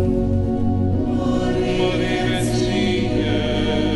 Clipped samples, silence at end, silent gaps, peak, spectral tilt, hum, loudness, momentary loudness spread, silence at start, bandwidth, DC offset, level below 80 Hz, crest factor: under 0.1%; 0 s; none; -8 dBFS; -6.5 dB/octave; none; -20 LUFS; 1 LU; 0 s; 11.5 kHz; under 0.1%; -30 dBFS; 12 dB